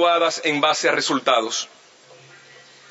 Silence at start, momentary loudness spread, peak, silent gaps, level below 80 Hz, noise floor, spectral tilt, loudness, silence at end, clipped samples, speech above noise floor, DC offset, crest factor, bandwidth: 0 s; 8 LU; -4 dBFS; none; -82 dBFS; -48 dBFS; -2 dB/octave; -19 LUFS; 1.25 s; under 0.1%; 28 dB; under 0.1%; 18 dB; 8.2 kHz